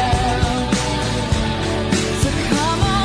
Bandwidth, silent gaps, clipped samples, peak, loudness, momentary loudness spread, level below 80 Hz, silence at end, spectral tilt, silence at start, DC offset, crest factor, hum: 14 kHz; none; under 0.1%; -6 dBFS; -19 LUFS; 3 LU; -28 dBFS; 0 s; -4.5 dB/octave; 0 s; under 0.1%; 12 dB; none